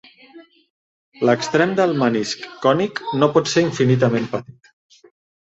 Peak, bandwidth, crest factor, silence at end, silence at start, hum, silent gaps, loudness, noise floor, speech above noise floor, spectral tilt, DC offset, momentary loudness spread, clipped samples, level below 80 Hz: -2 dBFS; 8 kHz; 18 dB; 1.05 s; 0.35 s; none; 0.70-1.12 s; -19 LUFS; -46 dBFS; 28 dB; -5.5 dB/octave; under 0.1%; 7 LU; under 0.1%; -60 dBFS